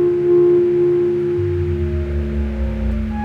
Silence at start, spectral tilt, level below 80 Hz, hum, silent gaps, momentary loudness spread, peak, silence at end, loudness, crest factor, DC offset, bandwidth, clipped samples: 0 s; -10.5 dB/octave; -26 dBFS; none; none; 9 LU; -6 dBFS; 0 s; -17 LUFS; 10 dB; under 0.1%; 4.4 kHz; under 0.1%